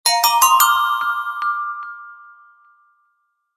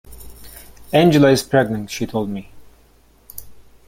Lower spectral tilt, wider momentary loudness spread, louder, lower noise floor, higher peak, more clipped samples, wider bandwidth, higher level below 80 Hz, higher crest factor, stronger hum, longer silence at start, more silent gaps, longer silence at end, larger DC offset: second, 3 dB/octave vs -6 dB/octave; second, 19 LU vs 26 LU; about the same, -16 LUFS vs -17 LUFS; first, -68 dBFS vs -52 dBFS; about the same, 0 dBFS vs -2 dBFS; neither; about the same, 16 kHz vs 17 kHz; second, -62 dBFS vs -46 dBFS; about the same, 20 dB vs 18 dB; neither; about the same, 0.05 s vs 0.1 s; neither; first, 1.4 s vs 0.35 s; neither